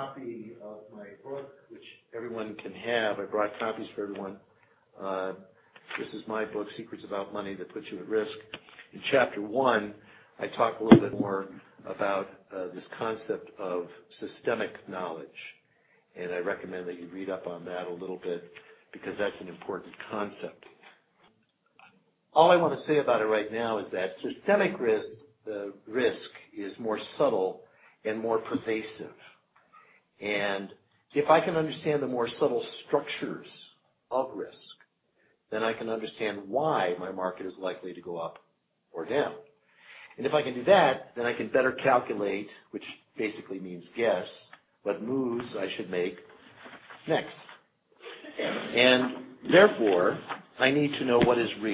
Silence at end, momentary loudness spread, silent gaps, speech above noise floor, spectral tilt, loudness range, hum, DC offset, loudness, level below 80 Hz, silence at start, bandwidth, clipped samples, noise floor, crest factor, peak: 0 s; 20 LU; none; 42 dB; -9 dB/octave; 11 LU; none; under 0.1%; -29 LUFS; -68 dBFS; 0 s; 4 kHz; under 0.1%; -71 dBFS; 28 dB; -2 dBFS